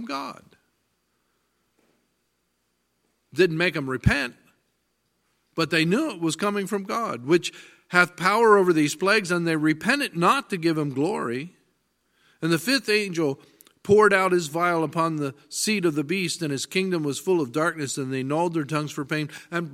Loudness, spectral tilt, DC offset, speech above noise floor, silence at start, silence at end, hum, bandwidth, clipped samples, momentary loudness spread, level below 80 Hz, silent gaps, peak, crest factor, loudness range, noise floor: -23 LUFS; -4.5 dB/octave; under 0.1%; 50 dB; 0 s; 0 s; none; 16 kHz; under 0.1%; 11 LU; -50 dBFS; none; 0 dBFS; 24 dB; 6 LU; -73 dBFS